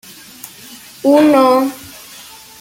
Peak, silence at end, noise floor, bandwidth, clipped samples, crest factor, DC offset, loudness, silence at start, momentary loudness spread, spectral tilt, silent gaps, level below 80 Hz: -2 dBFS; 0.75 s; -37 dBFS; 17 kHz; under 0.1%; 14 dB; under 0.1%; -12 LUFS; 0.45 s; 24 LU; -4.5 dB/octave; none; -58 dBFS